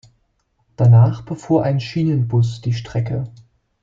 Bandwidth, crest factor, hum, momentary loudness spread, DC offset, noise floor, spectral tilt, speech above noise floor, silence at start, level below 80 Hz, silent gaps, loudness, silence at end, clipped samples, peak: 7.4 kHz; 16 dB; none; 13 LU; under 0.1%; -65 dBFS; -8.5 dB/octave; 46 dB; 0.8 s; -48 dBFS; none; -18 LUFS; 0.55 s; under 0.1%; -2 dBFS